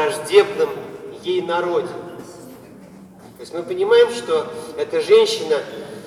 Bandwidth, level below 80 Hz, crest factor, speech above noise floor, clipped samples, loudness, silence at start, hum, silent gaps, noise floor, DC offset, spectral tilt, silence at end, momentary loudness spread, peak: 14 kHz; -64 dBFS; 20 dB; 24 dB; under 0.1%; -18 LUFS; 0 s; none; none; -42 dBFS; under 0.1%; -3.5 dB/octave; 0 s; 21 LU; 0 dBFS